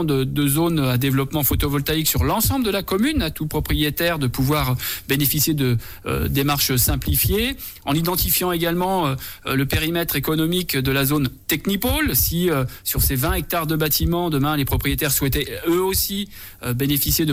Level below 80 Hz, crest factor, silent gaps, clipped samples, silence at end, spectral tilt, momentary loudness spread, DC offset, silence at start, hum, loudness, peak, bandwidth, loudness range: -32 dBFS; 14 dB; none; under 0.1%; 0 s; -4.5 dB/octave; 6 LU; under 0.1%; 0 s; none; -20 LUFS; -8 dBFS; 17 kHz; 1 LU